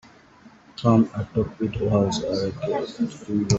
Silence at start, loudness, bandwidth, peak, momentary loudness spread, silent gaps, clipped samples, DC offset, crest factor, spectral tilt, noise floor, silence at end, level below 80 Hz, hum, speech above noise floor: 0.45 s; -24 LUFS; 8.2 kHz; -4 dBFS; 8 LU; none; under 0.1%; under 0.1%; 20 dB; -6.5 dB/octave; -51 dBFS; 0 s; -48 dBFS; none; 28 dB